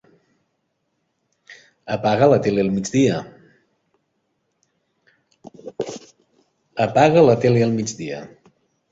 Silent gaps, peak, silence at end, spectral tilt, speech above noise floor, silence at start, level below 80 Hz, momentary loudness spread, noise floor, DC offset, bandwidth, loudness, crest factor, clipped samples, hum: none; -2 dBFS; 0.65 s; -6 dB/octave; 55 dB; 1.5 s; -56 dBFS; 20 LU; -72 dBFS; under 0.1%; 8 kHz; -18 LUFS; 20 dB; under 0.1%; none